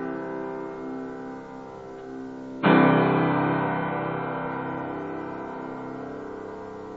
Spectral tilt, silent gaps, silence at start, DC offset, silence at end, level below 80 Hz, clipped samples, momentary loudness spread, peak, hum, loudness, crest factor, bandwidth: -8.5 dB/octave; none; 0 s; under 0.1%; 0 s; -62 dBFS; under 0.1%; 18 LU; -6 dBFS; none; -26 LUFS; 22 dB; 7.4 kHz